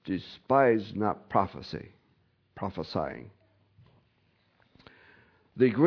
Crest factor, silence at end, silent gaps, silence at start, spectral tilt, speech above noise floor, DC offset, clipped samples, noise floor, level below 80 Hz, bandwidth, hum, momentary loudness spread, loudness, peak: 22 dB; 0 s; none; 0.05 s; -8.5 dB/octave; 42 dB; under 0.1%; under 0.1%; -69 dBFS; -62 dBFS; 5.4 kHz; none; 18 LU; -29 LUFS; -10 dBFS